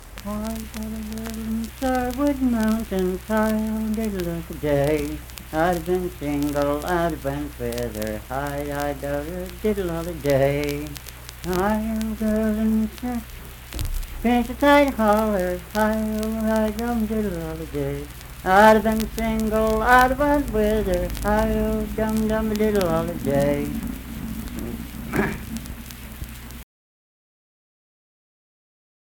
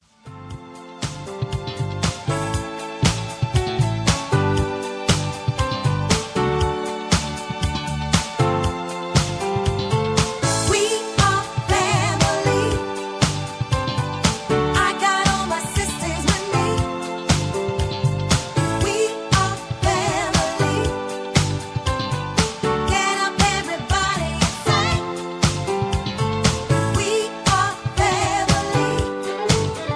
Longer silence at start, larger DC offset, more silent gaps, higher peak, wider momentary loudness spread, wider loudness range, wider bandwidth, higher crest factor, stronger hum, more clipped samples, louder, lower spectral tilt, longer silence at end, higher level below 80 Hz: second, 0 s vs 0.25 s; neither; neither; about the same, -2 dBFS vs 0 dBFS; first, 13 LU vs 7 LU; first, 8 LU vs 2 LU; first, 19 kHz vs 11 kHz; about the same, 20 dB vs 20 dB; neither; neither; about the same, -23 LUFS vs -21 LUFS; first, -6 dB/octave vs -4.5 dB/octave; first, 2.45 s vs 0 s; about the same, -36 dBFS vs -34 dBFS